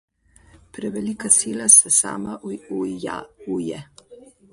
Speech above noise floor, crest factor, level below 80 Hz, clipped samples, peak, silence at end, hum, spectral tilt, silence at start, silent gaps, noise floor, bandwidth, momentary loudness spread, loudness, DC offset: 32 dB; 22 dB; -60 dBFS; under 0.1%; 0 dBFS; 0.4 s; none; -2.5 dB/octave; 0.75 s; none; -53 dBFS; 12 kHz; 21 LU; -17 LUFS; under 0.1%